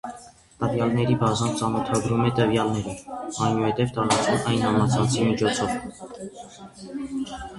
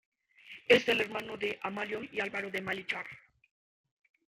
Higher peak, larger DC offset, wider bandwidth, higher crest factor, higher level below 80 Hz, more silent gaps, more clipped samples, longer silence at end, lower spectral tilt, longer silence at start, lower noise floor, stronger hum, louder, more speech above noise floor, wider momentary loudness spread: about the same, -6 dBFS vs -8 dBFS; neither; second, 11.5 kHz vs 15.5 kHz; second, 18 dB vs 26 dB; first, -50 dBFS vs -72 dBFS; neither; neither; second, 0 s vs 1.2 s; first, -5.5 dB/octave vs -4 dB/octave; second, 0.05 s vs 0.45 s; second, -45 dBFS vs -54 dBFS; neither; first, -24 LUFS vs -32 LUFS; about the same, 22 dB vs 22 dB; first, 17 LU vs 14 LU